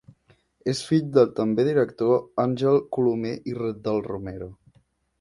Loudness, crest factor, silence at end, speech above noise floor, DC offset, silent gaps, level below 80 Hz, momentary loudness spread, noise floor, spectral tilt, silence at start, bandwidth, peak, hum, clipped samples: -24 LUFS; 20 dB; 0.65 s; 40 dB; under 0.1%; none; -58 dBFS; 12 LU; -64 dBFS; -7 dB/octave; 0.65 s; 11.5 kHz; -4 dBFS; none; under 0.1%